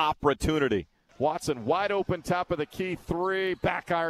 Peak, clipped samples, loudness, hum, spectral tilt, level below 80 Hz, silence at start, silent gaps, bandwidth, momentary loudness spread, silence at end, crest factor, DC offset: -10 dBFS; under 0.1%; -28 LUFS; none; -5.5 dB/octave; -48 dBFS; 0 s; none; 14 kHz; 6 LU; 0 s; 16 dB; under 0.1%